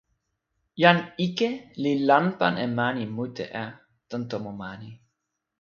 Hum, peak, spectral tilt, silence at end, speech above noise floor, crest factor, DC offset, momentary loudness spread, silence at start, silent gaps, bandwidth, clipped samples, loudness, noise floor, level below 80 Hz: none; 0 dBFS; -6.5 dB/octave; 0.65 s; 55 dB; 26 dB; under 0.1%; 17 LU; 0.75 s; none; 7 kHz; under 0.1%; -25 LUFS; -80 dBFS; -66 dBFS